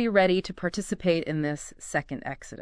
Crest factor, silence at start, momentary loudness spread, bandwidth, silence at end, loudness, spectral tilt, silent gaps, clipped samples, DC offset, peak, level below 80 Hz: 20 dB; 0 s; 13 LU; 11 kHz; 0 s; -28 LUFS; -5 dB/octave; none; under 0.1%; under 0.1%; -8 dBFS; -52 dBFS